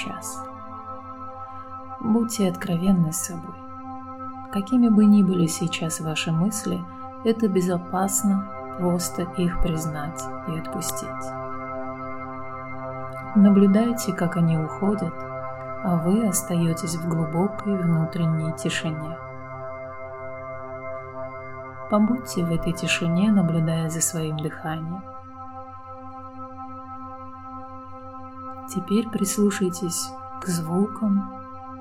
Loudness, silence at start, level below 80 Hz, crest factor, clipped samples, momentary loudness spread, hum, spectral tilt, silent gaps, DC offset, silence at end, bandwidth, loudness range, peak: -24 LUFS; 0 s; -44 dBFS; 18 dB; under 0.1%; 17 LU; none; -5.5 dB/octave; none; 0.3%; 0 s; 16 kHz; 10 LU; -6 dBFS